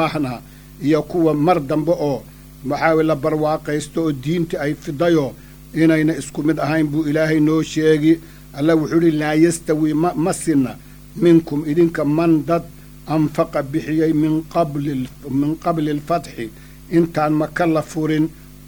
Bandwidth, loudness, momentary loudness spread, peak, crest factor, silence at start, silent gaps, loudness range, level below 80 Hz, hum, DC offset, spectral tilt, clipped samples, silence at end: over 20 kHz; -18 LUFS; 9 LU; 0 dBFS; 18 dB; 0 s; none; 3 LU; -44 dBFS; none; under 0.1%; -6.5 dB/octave; under 0.1%; 0 s